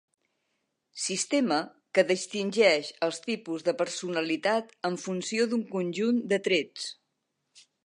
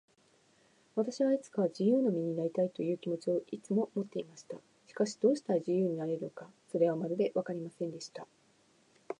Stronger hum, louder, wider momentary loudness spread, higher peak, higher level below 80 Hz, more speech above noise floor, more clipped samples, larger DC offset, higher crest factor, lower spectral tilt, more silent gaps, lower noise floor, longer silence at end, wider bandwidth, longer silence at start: neither; first, -28 LUFS vs -33 LUFS; second, 10 LU vs 16 LU; first, -8 dBFS vs -16 dBFS; about the same, -84 dBFS vs -86 dBFS; first, 52 dB vs 35 dB; neither; neither; about the same, 20 dB vs 18 dB; second, -3.5 dB/octave vs -7 dB/octave; neither; first, -80 dBFS vs -68 dBFS; first, 0.25 s vs 0.05 s; about the same, 11.5 kHz vs 10.5 kHz; about the same, 0.95 s vs 0.95 s